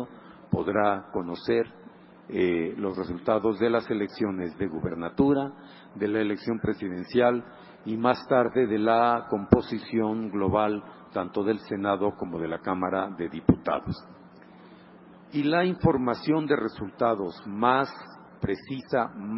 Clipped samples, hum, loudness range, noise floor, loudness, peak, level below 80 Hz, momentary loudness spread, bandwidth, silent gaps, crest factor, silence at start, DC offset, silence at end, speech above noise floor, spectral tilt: under 0.1%; none; 4 LU; -50 dBFS; -27 LUFS; 0 dBFS; -50 dBFS; 10 LU; 5.8 kHz; none; 26 dB; 0 s; under 0.1%; 0 s; 24 dB; -11 dB/octave